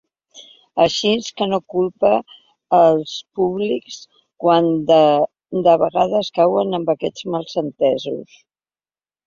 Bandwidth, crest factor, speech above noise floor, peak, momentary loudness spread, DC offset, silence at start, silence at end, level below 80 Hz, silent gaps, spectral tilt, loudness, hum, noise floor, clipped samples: 7.6 kHz; 16 dB; over 73 dB; -2 dBFS; 11 LU; under 0.1%; 0.35 s; 1.05 s; -60 dBFS; none; -5.5 dB/octave; -18 LUFS; none; under -90 dBFS; under 0.1%